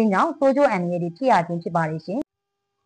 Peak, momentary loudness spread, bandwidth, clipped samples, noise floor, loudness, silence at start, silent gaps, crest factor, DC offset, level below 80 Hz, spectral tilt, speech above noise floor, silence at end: -8 dBFS; 11 LU; 9.6 kHz; under 0.1%; -81 dBFS; -22 LUFS; 0 s; none; 14 dB; under 0.1%; -66 dBFS; -7.5 dB/octave; 60 dB; 0.65 s